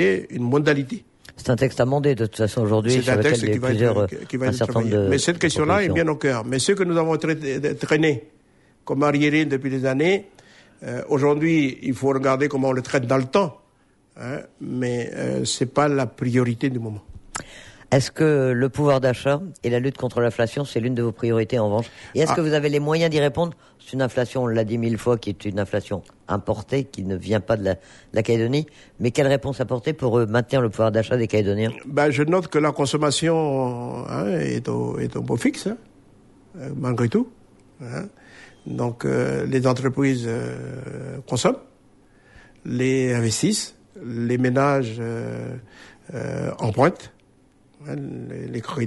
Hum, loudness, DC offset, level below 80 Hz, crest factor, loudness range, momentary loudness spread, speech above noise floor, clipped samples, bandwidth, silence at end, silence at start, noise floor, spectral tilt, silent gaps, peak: none; -22 LUFS; under 0.1%; -54 dBFS; 16 dB; 5 LU; 13 LU; 38 dB; under 0.1%; 11.5 kHz; 0 s; 0 s; -59 dBFS; -6 dB/octave; none; -6 dBFS